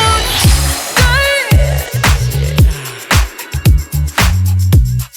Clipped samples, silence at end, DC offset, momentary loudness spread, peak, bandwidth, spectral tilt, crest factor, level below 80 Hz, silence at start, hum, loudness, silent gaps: under 0.1%; 0.1 s; under 0.1%; 4 LU; 0 dBFS; over 20 kHz; -4 dB/octave; 12 dB; -16 dBFS; 0 s; none; -12 LUFS; none